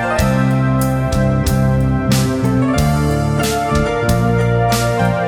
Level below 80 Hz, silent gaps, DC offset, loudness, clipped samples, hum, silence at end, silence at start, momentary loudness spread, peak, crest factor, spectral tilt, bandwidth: -26 dBFS; none; under 0.1%; -15 LUFS; under 0.1%; none; 0 s; 0 s; 2 LU; 0 dBFS; 14 dB; -6 dB/octave; 19.5 kHz